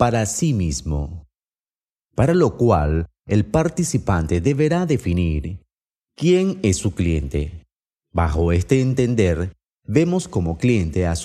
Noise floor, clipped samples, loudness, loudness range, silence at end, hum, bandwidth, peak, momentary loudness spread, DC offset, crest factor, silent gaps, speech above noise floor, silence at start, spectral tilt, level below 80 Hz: under -90 dBFS; under 0.1%; -20 LUFS; 2 LU; 0 s; none; 14 kHz; -2 dBFS; 10 LU; under 0.1%; 18 dB; 1.92-1.96 s, 5.97-6.01 s, 7.76-7.80 s; over 71 dB; 0 s; -6.5 dB/octave; -32 dBFS